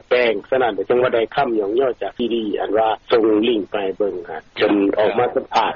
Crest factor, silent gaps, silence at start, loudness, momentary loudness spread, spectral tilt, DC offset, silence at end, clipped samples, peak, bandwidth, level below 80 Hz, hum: 14 dB; none; 0.1 s; -19 LUFS; 7 LU; -3 dB/octave; under 0.1%; 0 s; under 0.1%; -4 dBFS; 7 kHz; -54 dBFS; none